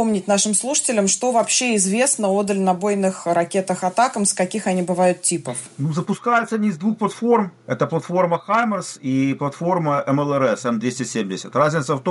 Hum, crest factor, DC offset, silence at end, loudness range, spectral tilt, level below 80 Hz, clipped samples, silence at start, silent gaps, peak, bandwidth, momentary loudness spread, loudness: none; 14 dB; under 0.1%; 0 s; 3 LU; -4 dB/octave; -66 dBFS; under 0.1%; 0 s; none; -6 dBFS; 11.5 kHz; 7 LU; -20 LUFS